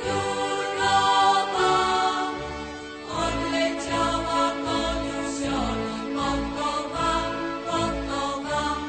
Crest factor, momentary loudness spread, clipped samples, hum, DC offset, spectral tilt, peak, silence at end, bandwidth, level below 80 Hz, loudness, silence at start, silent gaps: 16 dB; 8 LU; under 0.1%; none; under 0.1%; -3.5 dB/octave; -8 dBFS; 0 s; 9.2 kHz; -42 dBFS; -25 LUFS; 0 s; none